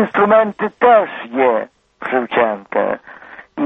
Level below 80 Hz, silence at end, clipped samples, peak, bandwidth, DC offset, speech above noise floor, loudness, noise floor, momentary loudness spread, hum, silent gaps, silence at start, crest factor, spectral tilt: -58 dBFS; 0 s; under 0.1%; 0 dBFS; 4 kHz; under 0.1%; 23 dB; -15 LUFS; -38 dBFS; 17 LU; none; none; 0 s; 16 dB; -8 dB/octave